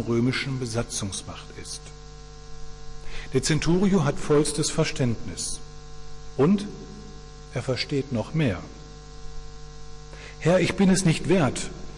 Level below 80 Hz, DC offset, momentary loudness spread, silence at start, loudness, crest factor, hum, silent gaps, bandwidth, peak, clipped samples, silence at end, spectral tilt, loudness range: -42 dBFS; under 0.1%; 23 LU; 0 s; -25 LUFS; 14 dB; 50 Hz at -45 dBFS; none; 11.5 kHz; -12 dBFS; under 0.1%; 0 s; -5 dB/octave; 6 LU